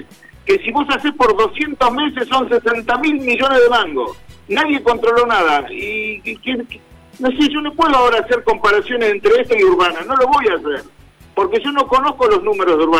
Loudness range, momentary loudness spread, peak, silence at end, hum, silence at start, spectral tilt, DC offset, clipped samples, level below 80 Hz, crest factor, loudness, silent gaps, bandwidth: 3 LU; 10 LU; -4 dBFS; 0 s; none; 0 s; -4 dB/octave; under 0.1%; under 0.1%; -44 dBFS; 12 dB; -15 LUFS; none; 14.5 kHz